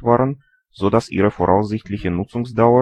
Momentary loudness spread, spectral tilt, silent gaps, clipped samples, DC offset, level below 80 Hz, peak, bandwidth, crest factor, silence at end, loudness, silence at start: 8 LU; -8 dB/octave; none; under 0.1%; under 0.1%; -44 dBFS; 0 dBFS; 10.5 kHz; 16 dB; 0 s; -19 LUFS; 0 s